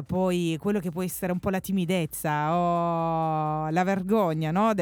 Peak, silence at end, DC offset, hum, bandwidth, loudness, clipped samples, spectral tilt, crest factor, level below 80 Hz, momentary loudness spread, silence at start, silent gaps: -12 dBFS; 0 s; under 0.1%; none; over 20 kHz; -26 LUFS; under 0.1%; -6.5 dB/octave; 14 dB; -56 dBFS; 4 LU; 0 s; none